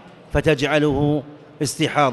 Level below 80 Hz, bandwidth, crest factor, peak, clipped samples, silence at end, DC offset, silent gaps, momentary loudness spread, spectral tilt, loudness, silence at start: -40 dBFS; 12 kHz; 16 dB; -4 dBFS; under 0.1%; 0 s; under 0.1%; none; 8 LU; -5 dB/octave; -20 LUFS; 0.05 s